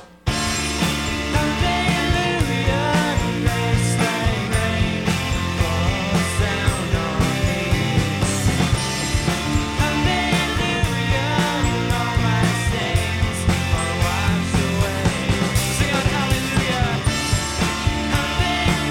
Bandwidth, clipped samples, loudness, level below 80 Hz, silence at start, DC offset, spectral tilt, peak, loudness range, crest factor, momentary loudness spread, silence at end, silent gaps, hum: 17 kHz; under 0.1%; -20 LUFS; -30 dBFS; 0 s; under 0.1%; -4.5 dB/octave; -8 dBFS; 1 LU; 12 dB; 2 LU; 0 s; none; none